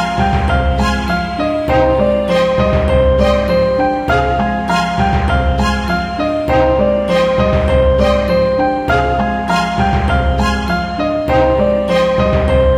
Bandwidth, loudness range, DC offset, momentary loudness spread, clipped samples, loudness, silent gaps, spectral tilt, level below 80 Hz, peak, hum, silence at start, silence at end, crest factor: 12 kHz; 1 LU; under 0.1%; 5 LU; under 0.1%; -14 LUFS; none; -6.5 dB/octave; -20 dBFS; 0 dBFS; none; 0 s; 0 s; 12 dB